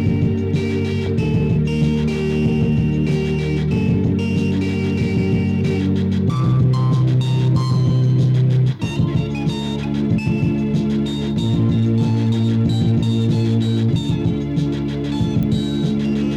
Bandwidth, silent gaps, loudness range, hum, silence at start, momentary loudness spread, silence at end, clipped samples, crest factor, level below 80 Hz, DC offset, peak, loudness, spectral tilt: 9.2 kHz; none; 2 LU; none; 0 s; 4 LU; 0 s; under 0.1%; 10 dB; -36 dBFS; under 0.1%; -6 dBFS; -18 LUFS; -8 dB/octave